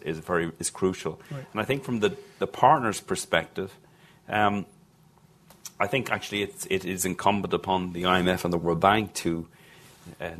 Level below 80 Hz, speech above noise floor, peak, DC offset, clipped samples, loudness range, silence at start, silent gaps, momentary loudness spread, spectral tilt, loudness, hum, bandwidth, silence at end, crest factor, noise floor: -54 dBFS; 31 dB; -4 dBFS; under 0.1%; under 0.1%; 4 LU; 0.05 s; none; 13 LU; -4.5 dB/octave; -26 LUFS; none; 14.5 kHz; 0 s; 24 dB; -58 dBFS